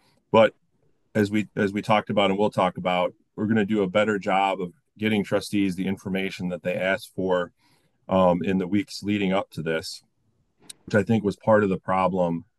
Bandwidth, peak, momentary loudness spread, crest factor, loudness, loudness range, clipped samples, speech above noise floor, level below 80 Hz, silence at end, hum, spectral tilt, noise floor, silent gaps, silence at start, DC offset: 12.5 kHz; -6 dBFS; 8 LU; 18 dB; -24 LUFS; 3 LU; under 0.1%; 47 dB; -62 dBFS; 0.15 s; none; -6.5 dB/octave; -70 dBFS; none; 0.35 s; under 0.1%